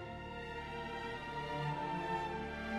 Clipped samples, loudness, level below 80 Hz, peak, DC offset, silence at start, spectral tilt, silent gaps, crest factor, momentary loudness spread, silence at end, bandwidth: under 0.1%; -41 LUFS; -56 dBFS; -26 dBFS; under 0.1%; 0 s; -6 dB/octave; none; 14 dB; 6 LU; 0 s; 13 kHz